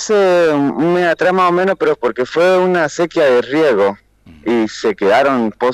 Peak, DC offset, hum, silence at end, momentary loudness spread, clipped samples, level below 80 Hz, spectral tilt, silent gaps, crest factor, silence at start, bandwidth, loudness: -2 dBFS; under 0.1%; none; 0 s; 5 LU; under 0.1%; -54 dBFS; -5.5 dB/octave; none; 12 dB; 0 s; 13 kHz; -14 LUFS